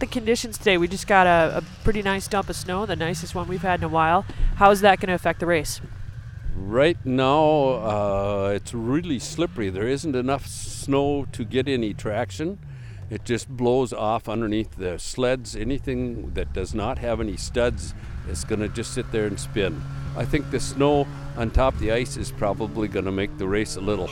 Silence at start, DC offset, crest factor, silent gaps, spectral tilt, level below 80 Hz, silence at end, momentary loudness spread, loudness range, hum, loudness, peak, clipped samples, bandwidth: 0 s; under 0.1%; 20 dB; none; -5.5 dB/octave; -34 dBFS; 0 s; 12 LU; 6 LU; none; -24 LUFS; -2 dBFS; under 0.1%; 17 kHz